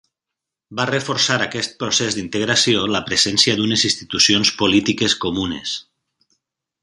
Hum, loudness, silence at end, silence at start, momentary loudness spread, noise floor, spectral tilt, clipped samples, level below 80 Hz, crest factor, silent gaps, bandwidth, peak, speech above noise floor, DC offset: none; -17 LUFS; 1 s; 0.7 s; 10 LU; -84 dBFS; -2.5 dB/octave; under 0.1%; -50 dBFS; 20 dB; none; 11.5 kHz; 0 dBFS; 65 dB; under 0.1%